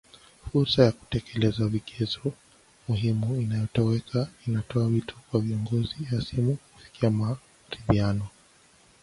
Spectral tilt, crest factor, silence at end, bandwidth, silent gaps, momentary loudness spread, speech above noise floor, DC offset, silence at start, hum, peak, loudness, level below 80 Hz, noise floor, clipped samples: -7.5 dB/octave; 22 dB; 0.75 s; 11.5 kHz; none; 9 LU; 32 dB; under 0.1%; 0.45 s; none; -6 dBFS; -27 LUFS; -48 dBFS; -58 dBFS; under 0.1%